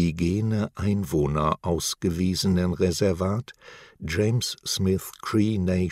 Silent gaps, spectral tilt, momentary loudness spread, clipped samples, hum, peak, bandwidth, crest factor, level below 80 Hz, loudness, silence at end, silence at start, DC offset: none; -5.5 dB/octave; 5 LU; under 0.1%; none; -8 dBFS; 16 kHz; 16 dB; -44 dBFS; -25 LUFS; 0 s; 0 s; under 0.1%